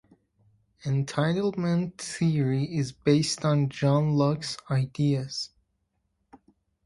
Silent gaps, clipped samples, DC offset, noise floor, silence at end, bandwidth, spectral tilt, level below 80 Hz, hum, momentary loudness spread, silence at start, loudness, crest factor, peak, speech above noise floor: none; under 0.1%; under 0.1%; -76 dBFS; 1.4 s; 11.5 kHz; -6 dB/octave; -60 dBFS; none; 9 LU; 0.85 s; -26 LUFS; 18 dB; -10 dBFS; 50 dB